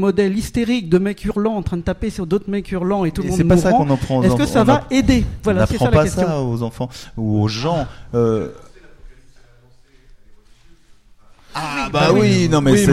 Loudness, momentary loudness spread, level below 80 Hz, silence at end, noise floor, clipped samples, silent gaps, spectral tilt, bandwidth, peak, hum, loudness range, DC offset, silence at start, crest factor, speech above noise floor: -17 LUFS; 10 LU; -34 dBFS; 0 s; -48 dBFS; under 0.1%; none; -6.5 dB/octave; 15 kHz; -2 dBFS; none; 10 LU; under 0.1%; 0 s; 16 dB; 32 dB